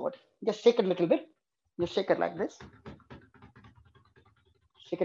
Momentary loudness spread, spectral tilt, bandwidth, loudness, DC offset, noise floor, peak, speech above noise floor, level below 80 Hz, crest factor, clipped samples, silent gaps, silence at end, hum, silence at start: 24 LU; -6 dB/octave; 7.6 kHz; -30 LUFS; under 0.1%; -68 dBFS; -10 dBFS; 39 dB; -68 dBFS; 22 dB; under 0.1%; none; 0 s; none; 0 s